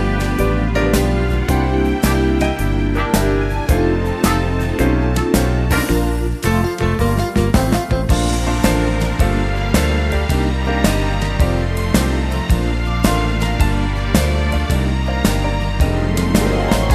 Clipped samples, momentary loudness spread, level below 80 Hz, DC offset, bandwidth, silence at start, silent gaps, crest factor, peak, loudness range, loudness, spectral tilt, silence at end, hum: under 0.1%; 3 LU; -20 dBFS; under 0.1%; 14 kHz; 0 s; none; 14 dB; 0 dBFS; 1 LU; -17 LUFS; -6 dB/octave; 0 s; none